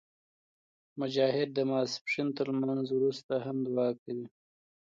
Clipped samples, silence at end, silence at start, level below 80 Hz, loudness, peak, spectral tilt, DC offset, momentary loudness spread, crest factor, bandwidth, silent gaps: under 0.1%; 0.6 s; 0.95 s; -82 dBFS; -32 LUFS; -14 dBFS; -6 dB/octave; under 0.1%; 11 LU; 18 dB; 7.6 kHz; 2.01-2.05 s, 3.24-3.29 s, 3.99-4.06 s